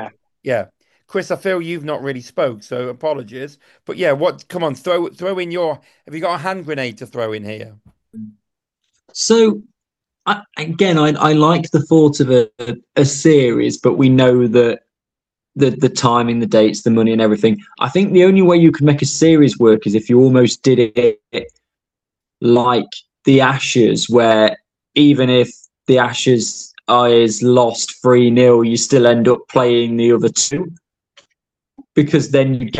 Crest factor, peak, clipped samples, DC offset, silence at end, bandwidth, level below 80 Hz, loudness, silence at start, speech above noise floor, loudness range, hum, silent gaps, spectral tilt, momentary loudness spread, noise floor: 14 dB; 0 dBFS; under 0.1%; under 0.1%; 0 s; 11 kHz; -56 dBFS; -14 LUFS; 0 s; 73 dB; 9 LU; none; none; -5.5 dB/octave; 14 LU; -86 dBFS